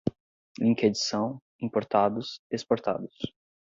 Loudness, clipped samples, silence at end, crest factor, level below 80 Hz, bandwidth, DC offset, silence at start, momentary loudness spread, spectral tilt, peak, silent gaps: -28 LUFS; under 0.1%; 0.4 s; 20 dB; -64 dBFS; 7.8 kHz; under 0.1%; 0.05 s; 12 LU; -5 dB/octave; -10 dBFS; 0.20-0.55 s, 1.42-1.59 s, 2.39-2.50 s